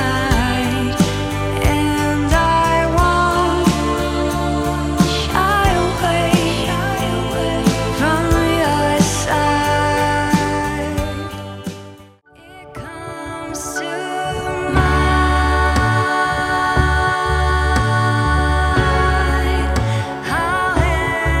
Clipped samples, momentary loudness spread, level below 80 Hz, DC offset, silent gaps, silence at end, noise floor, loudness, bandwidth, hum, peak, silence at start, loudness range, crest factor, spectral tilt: under 0.1%; 8 LU; -24 dBFS; under 0.1%; none; 0 s; -44 dBFS; -17 LUFS; 16 kHz; none; 0 dBFS; 0 s; 6 LU; 16 dB; -5 dB/octave